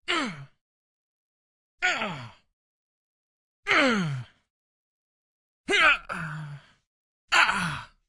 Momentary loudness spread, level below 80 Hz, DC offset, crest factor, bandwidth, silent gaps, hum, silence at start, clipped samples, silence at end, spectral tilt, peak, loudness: 19 LU; -60 dBFS; under 0.1%; 24 dB; 11.5 kHz; 0.61-1.78 s, 2.53-3.63 s, 4.50-5.64 s, 6.87-7.28 s; none; 0.1 s; under 0.1%; 0.25 s; -3.5 dB/octave; -6 dBFS; -24 LUFS